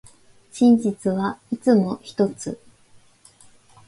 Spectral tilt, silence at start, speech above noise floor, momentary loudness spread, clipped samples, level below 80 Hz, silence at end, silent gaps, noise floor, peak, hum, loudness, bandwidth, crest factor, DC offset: -7 dB/octave; 0.55 s; 33 dB; 16 LU; under 0.1%; -62 dBFS; 1.3 s; none; -53 dBFS; -6 dBFS; none; -21 LUFS; 11.5 kHz; 16 dB; under 0.1%